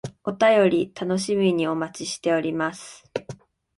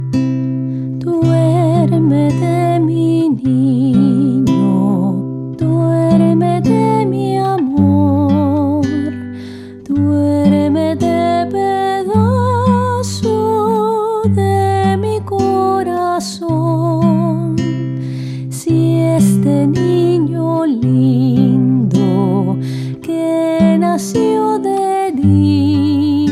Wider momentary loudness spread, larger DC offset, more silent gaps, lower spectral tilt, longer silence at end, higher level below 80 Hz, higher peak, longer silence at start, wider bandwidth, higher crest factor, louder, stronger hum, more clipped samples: first, 16 LU vs 7 LU; neither; neither; second, -5 dB/octave vs -8 dB/octave; first, 0.45 s vs 0 s; second, -64 dBFS vs -48 dBFS; second, -6 dBFS vs -2 dBFS; about the same, 0.05 s vs 0 s; second, 11.5 kHz vs 13.5 kHz; first, 18 dB vs 12 dB; second, -23 LUFS vs -14 LUFS; neither; neither